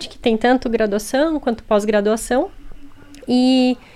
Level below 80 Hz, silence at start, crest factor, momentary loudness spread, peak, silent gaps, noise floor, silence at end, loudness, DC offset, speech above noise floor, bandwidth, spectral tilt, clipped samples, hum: -40 dBFS; 0 s; 16 dB; 6 LU; -2 dBFS; none; -37 dBFS; 0.15 s; -18 LUFS; under 0.1%; 20 dB; 14.5 kHz; -4.5 dB/octave; under 0.1%; none